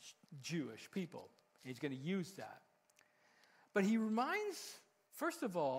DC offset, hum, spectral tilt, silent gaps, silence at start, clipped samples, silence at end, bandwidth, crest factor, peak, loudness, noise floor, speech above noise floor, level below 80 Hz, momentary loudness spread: under 0.1%; none; -5.5 dB/octave; none; 0 s; under 0.1%; 0 s; 16 kHz; 22 dB; -20 dBFS; -42 LUFS; -74 dBFS; 33 dB; under -90 dBFS; 20 LU